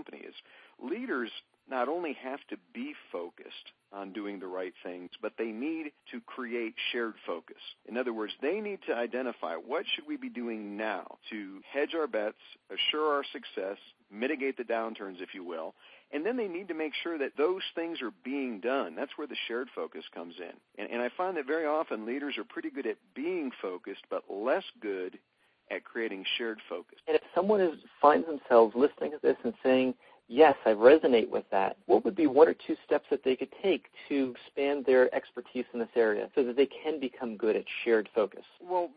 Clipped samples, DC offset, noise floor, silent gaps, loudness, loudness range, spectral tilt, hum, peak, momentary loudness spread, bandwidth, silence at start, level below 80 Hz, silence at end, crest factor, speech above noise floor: under 0.1%; under 0.1%; -55 dBFS; none; -31 LUFS; 12 LU; -7.5 dB/octave; none; -8 dBFS; 17 LU; 5 kHz; 0.1 s; -78 dBFS; 0.05 s; 24 dB; 24 dB